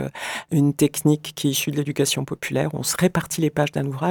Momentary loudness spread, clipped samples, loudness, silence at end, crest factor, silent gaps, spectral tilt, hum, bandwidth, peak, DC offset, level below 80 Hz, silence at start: 5 LU; under 0.1%; -22 LUFS; 0 s; 16 dB; none; -5 dB/octave; none; 19 kHz; -6 dBFS; under 0.1%; -54 dBFS; 0 s